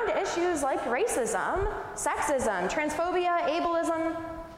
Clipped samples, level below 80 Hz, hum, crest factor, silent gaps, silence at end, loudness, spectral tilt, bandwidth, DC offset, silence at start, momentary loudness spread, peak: under 0.1%; -48 dBFS; none; 12 dB; none; 0 s; -28 LUFS; -3.5 dB/octave; 16 kHz; under 0.1%; 0 s; 4 LU; -16 dBFS